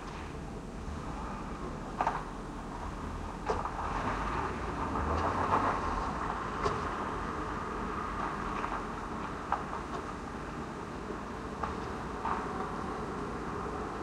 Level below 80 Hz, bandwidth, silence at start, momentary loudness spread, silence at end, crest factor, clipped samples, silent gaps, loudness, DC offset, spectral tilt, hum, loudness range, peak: -46 dBFS; 13 kHz; 0 s; 9 LU; 0 s; 20 dB; under 0.1%; none; -36 LUFS; under 0.1%; -6 dB/octave; none; 5 LU; -16 dBFS